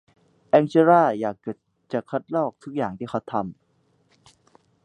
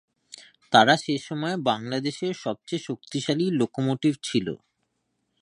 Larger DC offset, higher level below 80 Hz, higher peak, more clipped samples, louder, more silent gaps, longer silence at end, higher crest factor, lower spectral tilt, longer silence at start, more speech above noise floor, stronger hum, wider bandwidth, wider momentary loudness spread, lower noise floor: neither; about the same, -66 dBFS vs -68 dBFS; about the same, -2 dBFS vs -2 dBFS; neither; about the same, -23 LUFS vs -25 LUFS; neither; first, 1.35 s vs 0.85 s; about the same, 22 dB vs 24 dB; first, -8 dB/octave vs -5 dB/octave; first, 0.55 s vs 0.35 s; second, 43 dB vs 51 dB; neither; second, 9.4 kHz vs 11 kHz; first, 18 LU vs 13 LU; second, -65 dBFS vs -76 dBFS